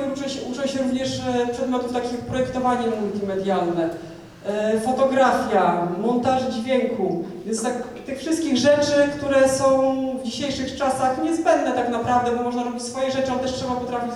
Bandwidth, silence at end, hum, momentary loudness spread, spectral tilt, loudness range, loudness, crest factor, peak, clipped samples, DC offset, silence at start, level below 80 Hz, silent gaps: 13.5 kHz; 0 s; none; 9 LU; -4.5 dB/octave; 4 LU; -22 LUFS; 16 dB; -6 dBFS; under 0.1%; under 0.1%; 0 s; -52 dBFS; none